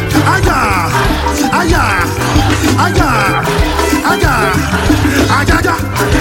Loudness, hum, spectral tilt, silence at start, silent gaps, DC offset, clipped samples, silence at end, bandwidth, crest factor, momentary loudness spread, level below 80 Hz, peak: -11 LUFS; none; -5 dB/octave; 0 s; none; under 0.1%; under 0.1%; 0 s; 17 kHz; 10 dB; 3 LU; -20 dBFS; 0 dBFS